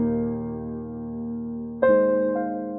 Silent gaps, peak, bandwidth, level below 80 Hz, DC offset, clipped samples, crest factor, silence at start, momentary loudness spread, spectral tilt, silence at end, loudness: none; -8 dBFS; 3.9 kHz; -50 dBFS; under 0.1%; under 0.1%; 18 dB; 0 s; 14 LU; -12.5 dB/octave; 0 s; -25 LUFS